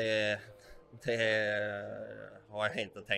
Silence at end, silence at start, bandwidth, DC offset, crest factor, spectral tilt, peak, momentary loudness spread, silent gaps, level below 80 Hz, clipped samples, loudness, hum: 0 s; 0 s; 12 kHz; under 0.1%; 20 dB; -4.5 dB/octave; -16 dBFS; 16 LU; none; -68 dBFS; under 0.1%; -34 LUFS; none